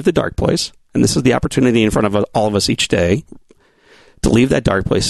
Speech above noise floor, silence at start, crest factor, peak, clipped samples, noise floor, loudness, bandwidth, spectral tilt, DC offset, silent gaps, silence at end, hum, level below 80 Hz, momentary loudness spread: 36 dB; 0 s; 14 dB; 0 dBFS; under 0.1%; -51 dBFS; -15 LUFS; 12.5 kHz; -5 dB/octave; 0.3%; none; 0 s; none; -34 dBFS; 5 LU